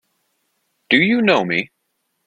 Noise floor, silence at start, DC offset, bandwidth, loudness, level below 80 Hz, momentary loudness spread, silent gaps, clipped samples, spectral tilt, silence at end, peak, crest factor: -71 dBFS; 0.9 s; under 0.1%; 8.4 kHz; -16 LUFS; -62 dBFS; 8 LU; none; under 0.1%; -6 dB/octave; 0.6 s; 0 dBFS; 20 dB